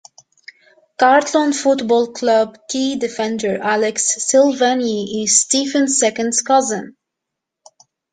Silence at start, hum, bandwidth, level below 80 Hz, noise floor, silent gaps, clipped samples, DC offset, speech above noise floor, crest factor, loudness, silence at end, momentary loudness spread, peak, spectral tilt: 1 s; none; 9.8 kHz; -64 dBFS; -81 dBFS; none; under 0.1%; under 0.1%; 65 dB; 16 dB; -16 LUFS; 1.2 s; 8 LU; 0 dBFS; -2 dB/octave